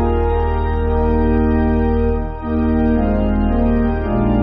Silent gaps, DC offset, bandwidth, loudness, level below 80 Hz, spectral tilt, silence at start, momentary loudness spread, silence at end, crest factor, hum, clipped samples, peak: none; under 0.1%; 5 kHz; -17 LUFS; -20 dBFS; -8.5 dB/octave; 0 s; 3 LU; 0 s; 12 dB; none; under 0.1%; -4 dBFS